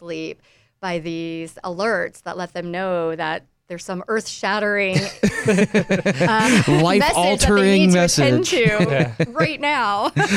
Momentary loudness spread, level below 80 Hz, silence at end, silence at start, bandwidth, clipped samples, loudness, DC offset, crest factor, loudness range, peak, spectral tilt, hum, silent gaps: 15 LU; -40 dBFS; 0 s; 0 s; 15.5 kHz; under 0.1%; -18 LUFS; under 0.1%; 16 dB; 10 LU; -4 dBFS; -5 dB/octave; none; none